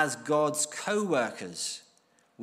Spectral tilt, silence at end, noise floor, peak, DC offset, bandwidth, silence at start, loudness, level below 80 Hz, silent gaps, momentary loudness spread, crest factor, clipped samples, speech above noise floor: -3 dB/octave; 0 s; -66 dBFS; -10 dBFS; under 0.1%; 15.5 kHz; 0 s; -29 LUFS; -82 dBFS; none; 8 LU; 20 dB; under 0.1%; 37 dB